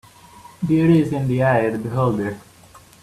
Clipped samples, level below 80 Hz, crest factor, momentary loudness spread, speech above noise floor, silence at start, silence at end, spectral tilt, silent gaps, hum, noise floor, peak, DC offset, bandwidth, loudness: under 0.1%; -52 dBFS; 16 dB; 13 LU; 29 dB; 0.35 s; 0.6 s; -8.5 dB/octave; none; none; -47 dBFS; -4 dBFS; under 0.1%; 13.5 kHz; -19 LUFS